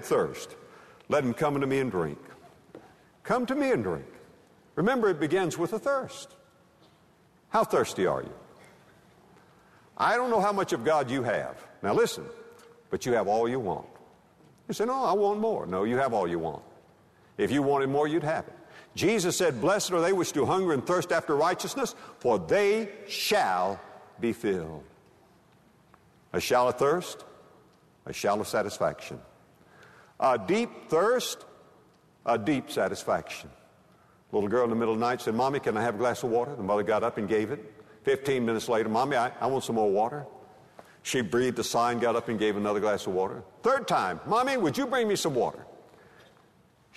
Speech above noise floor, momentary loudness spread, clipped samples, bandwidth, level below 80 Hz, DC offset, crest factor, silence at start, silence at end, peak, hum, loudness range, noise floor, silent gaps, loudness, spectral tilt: 34 dB; 13 LU; under 0.1%; 13.5 kHz; -64 dBFS; under 0.1%; 16 dB; 0 s; 1.15 s; -12 dBFS; none; 4 LU; -62 dBFS; none; -28 LUFS; -4.5 dB/octave